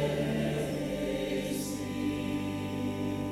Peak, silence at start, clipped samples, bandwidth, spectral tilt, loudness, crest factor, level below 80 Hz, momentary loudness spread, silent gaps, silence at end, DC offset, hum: -20 dBFS; 0 s; under 0.1%; 16 kHz; -6 dB/octave; -33 LUFS; 14 dB; -52 dBFS; 4 LU; none; 0 s; under 0.1%; none